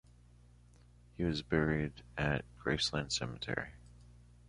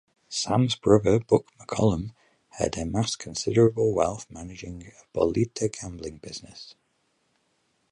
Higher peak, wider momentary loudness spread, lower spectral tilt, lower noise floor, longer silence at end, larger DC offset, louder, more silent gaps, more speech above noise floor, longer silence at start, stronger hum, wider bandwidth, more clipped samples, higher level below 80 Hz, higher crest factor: second, -16 dBFS vs -4 dBFS; second, 7 LU vs 19 LU; about the same, -4.5 dB/octave vs -5.5 dB/octave; second, -61 dBFS vs -71 dBFS; second, 0.3 s vs 1.2 s; neither; second, -36 LUFS vs -25 LUFS; neither; second, 25 dB vs 46 dB; first, 1.2 s vs 0.3 s; first, 60 Hz at -50 dBFS vs none; about the same, 11.5 kHz vs 11 kHz; neither; about the same, -52 dBFS vs -48 dBFS; about the same, 22 dB vs 22 dB